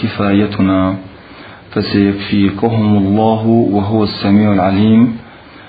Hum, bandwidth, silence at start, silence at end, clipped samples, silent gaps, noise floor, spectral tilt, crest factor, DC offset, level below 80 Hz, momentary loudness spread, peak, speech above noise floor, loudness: none; 5 kHz; 0 s; 0.05 s; under 0.1%; none; -35 dBFS; -11 dB/octave; 12 dB; under 0.1%; -46 dBFS; 6 LU; 0 dBFS; 23 dB; -13 LUFS